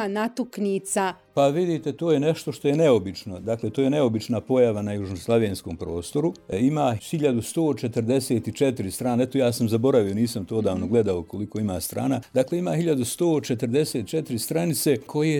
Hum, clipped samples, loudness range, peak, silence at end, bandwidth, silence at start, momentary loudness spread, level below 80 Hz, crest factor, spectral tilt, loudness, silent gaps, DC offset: none; under 0.1%; 2 LU; -8 dBFS; 0 s; 19.5 kHz; 0 s; 7 LU; -56 dBFS; 16 dB; -6 dB/octave; -24 LUFS; none; under 0.1%